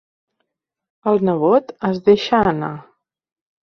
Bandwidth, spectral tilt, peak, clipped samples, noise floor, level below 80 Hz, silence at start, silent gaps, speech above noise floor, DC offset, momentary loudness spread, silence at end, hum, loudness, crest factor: 6.4 kHz; -7.5 dB/octave; -2 dBFS; under 0.1%; -75 dBFS; -52 dBFS; 1.05 s; none; 58 dB; under 0.1%; 11 LU; 0.8 s; none; -17 LUFS; 18 dB